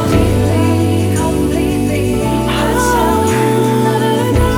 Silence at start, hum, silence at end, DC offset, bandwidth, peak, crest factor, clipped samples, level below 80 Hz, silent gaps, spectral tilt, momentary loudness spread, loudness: 0 s; none; 0 s; under 0.1%; 17.5 kHz; 0 dBFS; 12 dB; under 0.1%; -24 dBFS; none; -6 dB/octave; 3 LU; -13 LUFS